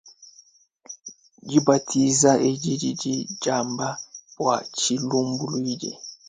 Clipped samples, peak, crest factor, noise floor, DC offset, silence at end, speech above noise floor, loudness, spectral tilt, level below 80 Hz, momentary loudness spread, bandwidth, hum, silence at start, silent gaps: under 0.1%; -4 dBFS; 20 dB; -56 dBFS; under 0.1%; 0.15 s; 33 dB; -23 LUFS; -4 dB/octave; -66 dBFS; 21 LU; 9.6 kHz; none; 0.05 s; none